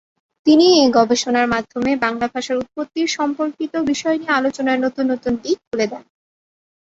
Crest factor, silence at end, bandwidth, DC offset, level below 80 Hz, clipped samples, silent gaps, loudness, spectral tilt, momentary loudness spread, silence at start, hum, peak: 16 dB; 0.95 s; 8 kHz; under 0.1%; -56 dBFS; under 0.1%; 5.67-5.71 s; -18 LUFS; -3.5 dB/octave; 10 LU; 0.45 s; none; -2 dBFS